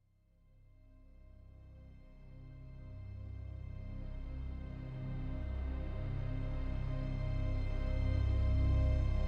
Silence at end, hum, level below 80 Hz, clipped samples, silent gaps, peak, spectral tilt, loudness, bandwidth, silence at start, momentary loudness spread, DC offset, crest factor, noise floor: 0 s; none; -40 dBFS; under 0.1%; none; -22 dBFS; -9 dB/octave; -39 LUFS; 5.6 kHz; 0.85 s; 24 LU; under 0.1%; 14 dB; -68 dBFS